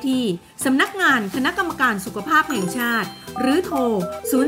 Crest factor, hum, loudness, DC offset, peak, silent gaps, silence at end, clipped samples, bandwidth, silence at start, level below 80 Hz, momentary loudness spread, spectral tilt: 16 dB; none; -20 LUFS; under 0.1%; -4 dBFS; none; 0 s; under 0.1%; 16.5 kHz; 0 s; -54 dBFS; 7 LU; -4 dB/octave